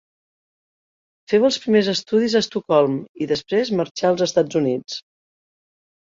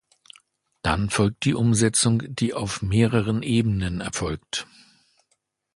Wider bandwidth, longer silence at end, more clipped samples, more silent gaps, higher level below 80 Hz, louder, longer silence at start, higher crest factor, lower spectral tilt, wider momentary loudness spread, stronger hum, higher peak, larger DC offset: second, 7.6 kHz vs 11.5 kHz; about the same, 1.05 s vs 1.1 s; neither; first, 3.09-3.14 s, 3.91-3.95 s vs none; second, -64 dBFS vs -42 dBFS; first, -20 LUFS vs -23 LUFS; first, 1.3 s vs 0.85 s; about the same, 18 dB vs 20 dB; about the same, -5 dB/octave vs -5 dB/octave; second, 7 LU vs 10 LU; neither; about the same, -4 dBFS vs -4 dBFS; neither